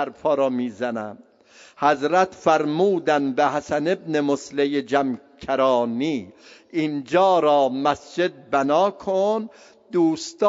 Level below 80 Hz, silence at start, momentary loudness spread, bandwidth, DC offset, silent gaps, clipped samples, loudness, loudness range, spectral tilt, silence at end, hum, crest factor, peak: -64 dBFS; 0 s; 9 LU; 7.8 kHz; under 0.1%; none; under 0.1%; -22 LUFS; 2 LU; -5.5 dB/octave; 0 s; none; 18 dB; -4 dBFS